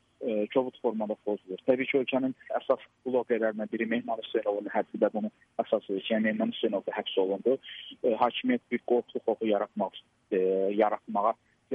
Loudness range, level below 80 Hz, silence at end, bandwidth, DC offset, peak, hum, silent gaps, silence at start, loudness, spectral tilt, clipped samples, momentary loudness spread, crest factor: 1 LU; -80 dBFS; 0 s; 4.4 kHz; under 0.1%; -12 dBFS; none; none; 0.2 s; -30 LUFS; -8 dB/octave; under 0.1%; 6 LU; 18 dB